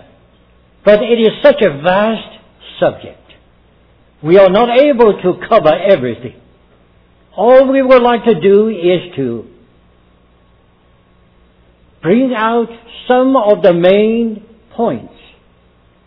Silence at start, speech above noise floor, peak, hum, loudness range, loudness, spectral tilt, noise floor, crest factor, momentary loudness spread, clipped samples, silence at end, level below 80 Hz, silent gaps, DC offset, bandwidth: 0.85 s; 39 dB; 0 dBFS; none; 7 LU; -11 LUFS; -9 dB/octave; -49 dBFS; 12 dB; 15 LU; 0.4%; 1 s; -46 dBFS; none; under 0.1%; 5.4 kHz